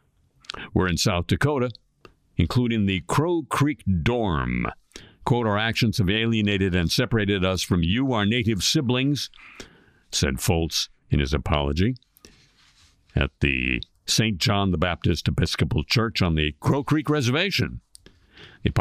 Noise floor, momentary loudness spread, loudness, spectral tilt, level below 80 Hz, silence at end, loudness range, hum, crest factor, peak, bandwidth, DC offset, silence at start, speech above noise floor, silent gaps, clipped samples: -58 dBFS; 7 LU; -23 LUFS; -5 dB/octave; -38 dBFS; 0 s; 4 LU; none; 18 dB; -6 dBFS; 15.5 kHz; under 0.1%; 0.55 s; 35 dB; none; under 0.1%